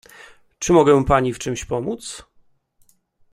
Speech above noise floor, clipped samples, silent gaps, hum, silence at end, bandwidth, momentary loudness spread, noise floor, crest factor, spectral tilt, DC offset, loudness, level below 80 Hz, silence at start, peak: 41 dB; under 0.1%; none; none; 1.1 s; 14.5 kHz; 17 LU; -59 dBFS; 18 dB; -5.5 dB/octave; under 0.1%; -19 LUFS; -40 dBFS; 0.6 s; -2 dBFS